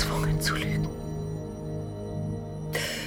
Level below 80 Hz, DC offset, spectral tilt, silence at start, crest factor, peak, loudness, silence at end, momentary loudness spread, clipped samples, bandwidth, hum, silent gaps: -42 dBFS; under 0.1%; -5 dB/octave; 0 s; 18 dB; -12 dBFS; -31 LUFS; 0 s; 9 LU; under 0.1%; over 20 kHz; none; none